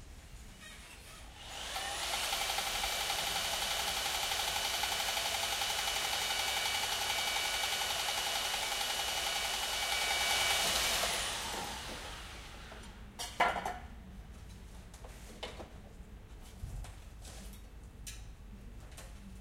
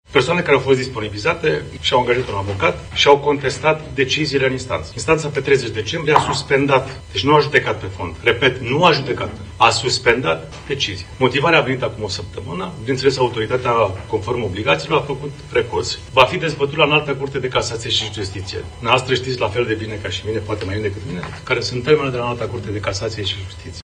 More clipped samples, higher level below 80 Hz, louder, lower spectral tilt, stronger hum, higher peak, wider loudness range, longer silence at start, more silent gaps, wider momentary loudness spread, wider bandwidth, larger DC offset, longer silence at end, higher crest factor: neither; second, -52 dBFS vs -42 dBFS; second, -33 LUFS vs -18 LUFS; second, -0.5 dB/octave vs -4.5 dB/octave; neither; second, -14 dBFS vs 0 dBFS; first, 18 LU vs 4 LU; about the same, 0 s vs 0.1 s; neither; first, 21 LU vs 10 LU; first, 16 kHz vs 10 kHz; neither; about the same, 0 s vs 0 s; about the same, 22 dB vs 18 dB